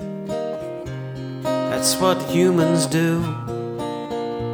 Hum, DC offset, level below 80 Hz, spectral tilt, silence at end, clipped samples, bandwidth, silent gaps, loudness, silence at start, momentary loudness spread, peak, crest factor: none; under 0.1%; -50 dBFS; -5 dB/octave; 0 s; under 0.1%; over 20 kHz; none; -22 LUFS; 0 s; 13 LU; -4 dBFS; 16 dB